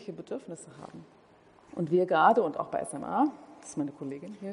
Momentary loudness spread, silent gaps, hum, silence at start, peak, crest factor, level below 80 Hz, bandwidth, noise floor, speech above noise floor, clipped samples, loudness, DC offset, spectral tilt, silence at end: 23 LU; none; none; 0 s; -8 dBFS; 22 dB; -74 dBFS; 10.5 kHz; -58 dBFS; 28 dB; under 0.1%; -29 LUFS; under 0.1%; -6 dB/octave; 0 s